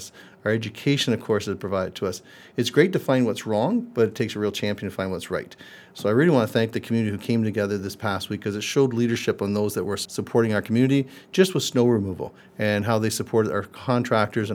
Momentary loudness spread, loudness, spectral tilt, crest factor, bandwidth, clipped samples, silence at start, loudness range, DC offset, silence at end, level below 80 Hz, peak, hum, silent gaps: 9 LU; -24 LUFS; -5.5 dB/octave; 20 dB; 18.5 kHz; under 0.1%; 0 s; 2 LU; under 0.1%; 0 s; -64 dBFS; -2 dBFS; none; none